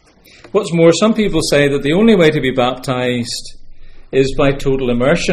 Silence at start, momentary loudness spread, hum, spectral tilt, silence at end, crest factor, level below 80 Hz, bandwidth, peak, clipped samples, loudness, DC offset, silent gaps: 0.55 s; 9 LU; none; -5.5 dB/octave; 0 s; 14 dB; -30 dBFS; 14.5 kHz; 0 dBFS; under 0.1%; -14 LUFS; under 0.1%; none